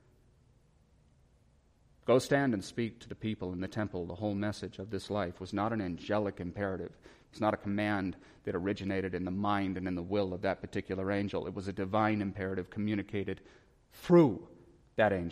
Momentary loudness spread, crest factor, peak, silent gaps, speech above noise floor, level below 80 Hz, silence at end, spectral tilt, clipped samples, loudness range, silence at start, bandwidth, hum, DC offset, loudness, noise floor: 11 LU; 20 dB; -12 dBFS; none; 34 dB; -62 dBFS; 0 s; -7 dB/octave; under 0.1%; 4 LU; 2.05 s; 15 kHz; none; under 0.1%; -34 LUFS; -66 dBFS